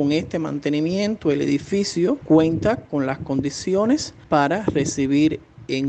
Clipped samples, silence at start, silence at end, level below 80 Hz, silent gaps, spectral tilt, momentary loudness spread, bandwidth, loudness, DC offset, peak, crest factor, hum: under 0.1%; 0 s; 0 s; -50 dBFS; none; -5.5 dB/octave; 7 LU; 8.8 kHz; -21 LUFS; under 0.1%; -4 dBFS; 18 dB; none